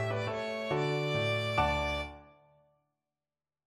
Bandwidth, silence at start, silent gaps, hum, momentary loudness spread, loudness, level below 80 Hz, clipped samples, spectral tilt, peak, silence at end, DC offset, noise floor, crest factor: 13.5 kHz; 0 s; none; none; 6 LU; -32 LUFS; -50 dBFS; under 0.1%; -5.5 dB/octave; -14 dBFS; 1.4 s; under 0.1%; under -90 dBFS; 20 dB